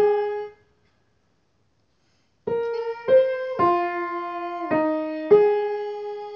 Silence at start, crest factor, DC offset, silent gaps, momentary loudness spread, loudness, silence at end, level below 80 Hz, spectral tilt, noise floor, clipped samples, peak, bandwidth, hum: 0 s; 18 dB; under 0.1%; none; 13 LU; -23 LUFS; 0 s; -64 dBFS; -7.5 dB/octave; -68 dBFS; under 0.1%; -4 dBFS; 5.8 kHz; none